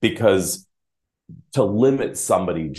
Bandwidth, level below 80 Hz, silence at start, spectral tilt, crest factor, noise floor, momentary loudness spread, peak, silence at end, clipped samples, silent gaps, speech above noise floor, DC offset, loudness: 12.5 kHz; -56 dBFS; 0 s; -5 dB/octave; 18 dB; -81 dBFS; 9 LU; -2 dBFS; 0 s; under 0.1%; none; 62 dB; under 0.1%; -20 LUFS